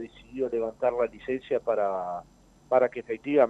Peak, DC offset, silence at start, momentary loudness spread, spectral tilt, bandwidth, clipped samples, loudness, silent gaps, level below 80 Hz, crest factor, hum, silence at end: -8 dBFS; under 0.1%; 0 s; 10 LU; -7 dB/octave; 8 kHz; under 0.1%; -28 LUFS; none; -60 dBFS; 20 dB; none; 0 s